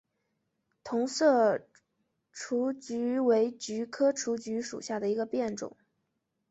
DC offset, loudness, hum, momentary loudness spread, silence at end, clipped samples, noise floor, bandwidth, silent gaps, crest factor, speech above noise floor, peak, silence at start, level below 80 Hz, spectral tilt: under 0.1%; -30 LUFS; none; 12 LU; 0.8 s; under 0.1%; -81 dBFS; 8.2 kHz; none; 18 dB; 52 dB; -14 dBFS; 0.85 s; -76 dBFS; -4 dB/octave